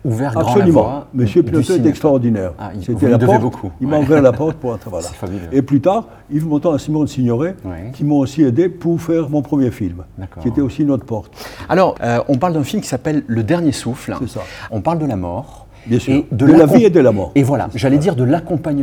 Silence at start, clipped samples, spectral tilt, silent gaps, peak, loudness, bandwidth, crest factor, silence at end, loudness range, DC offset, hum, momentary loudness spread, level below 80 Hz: 0.05 s; 0.1%; -7.5 dB/octave; none; 0 dBFS; -15 LUFS; 16 kHz; 14 dB; 0 s; 5 LU; under 0.1%; none; 13 LU; -44 dBFS